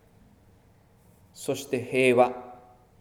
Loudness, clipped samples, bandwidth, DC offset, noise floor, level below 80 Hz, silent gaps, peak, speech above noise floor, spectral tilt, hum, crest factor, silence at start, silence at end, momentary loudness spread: -25 LUFS; under 0.1%; 17 kHz; under 0.1%; -59 dBFS; -66 dBFS; none; -6 dBFS; 35 dB; -5 dB/octave; none; 22 dB; 1.4 s; 0.45 s; 20 LU